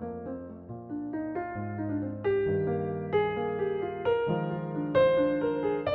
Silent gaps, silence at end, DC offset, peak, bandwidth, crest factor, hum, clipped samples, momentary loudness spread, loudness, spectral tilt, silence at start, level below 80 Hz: none; 0 s; under 0.1%; -12 dBFS; 4.6 kHz; 16 dB; none; under 0.1%; 13 LU; -30 LUFS; -6 dB/octave; 0 s; -60 dBFS